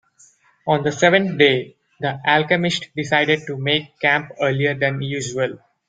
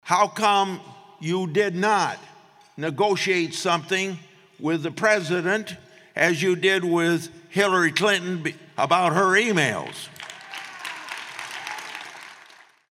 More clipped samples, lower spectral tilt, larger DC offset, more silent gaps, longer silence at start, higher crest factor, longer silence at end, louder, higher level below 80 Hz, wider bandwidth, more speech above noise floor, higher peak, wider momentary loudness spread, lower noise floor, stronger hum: neither; about the same, -4.5 dB/octave vs -4 dB/octave; neither; neither; first, 0.65 s vs 0.05 s; about the same, 18 dB vs 18 dB; second, 0.3 s vs 0.55 s; first, -19 LUFS vs -23 LUFS; first, -60 dBFS vs -76 dBFS; second, 9.4 kHz vs 15.5 kHz; first, 35 dB vs 29 dB; first, -2 dBFS vs -6 dBFS; second, 9 LU vs 16 LU; about the same, -54 dBFS vs -51 dBFS; neither